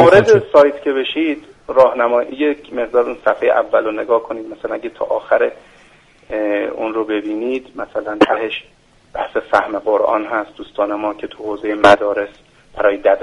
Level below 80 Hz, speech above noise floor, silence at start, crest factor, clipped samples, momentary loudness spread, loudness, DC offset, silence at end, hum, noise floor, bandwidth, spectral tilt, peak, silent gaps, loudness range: -50 dBFS; 32 dB; 0 s; 16 dB; under 0.1%; 14 LU; -16 LUFS; under 0.1%; 0 s; none; -48 dBFS; 11 kHz; -5.5 dB/octave; 0 dBFS; none; 5 LU